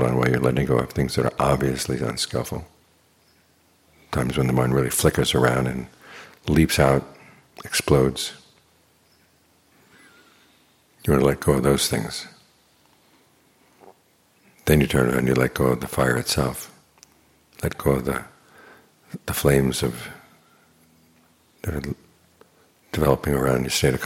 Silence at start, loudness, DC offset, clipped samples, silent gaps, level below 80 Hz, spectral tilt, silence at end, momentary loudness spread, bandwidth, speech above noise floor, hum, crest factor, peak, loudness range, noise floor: 0 s; -22 LUFS; under 0.1%; under 0.1%; none; -40 dBFS; -5 dB/octave; 0 s; 15 LU; 17 kHz; 40 dB; none; 22 dB; -2 dBFS; 6 LU; -61 dBFS